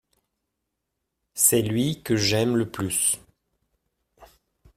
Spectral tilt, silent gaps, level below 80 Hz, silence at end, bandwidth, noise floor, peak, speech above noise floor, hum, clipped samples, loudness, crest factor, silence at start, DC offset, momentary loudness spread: -3.5 dB/octave; none; -58 dBFS; 0.5 s; 16 kHz; -81 dBFS; -4 dBFS; 57 dB; none; under 0.1%; -22 LUFS; 22 dB; 1.35 s; under 0.1%; 7 LU